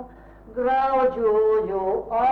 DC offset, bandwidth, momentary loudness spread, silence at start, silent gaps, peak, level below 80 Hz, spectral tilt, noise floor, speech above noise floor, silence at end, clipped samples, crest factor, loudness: under 0.1%; 4.8 kHz; 6 LU; 0 s; none; -12 dBFS; -48 dBFS; -7.5 dB/octave; -45 dBFS; 24 dB; 0 s; under 0.1%; 10 dB; -22 LUFS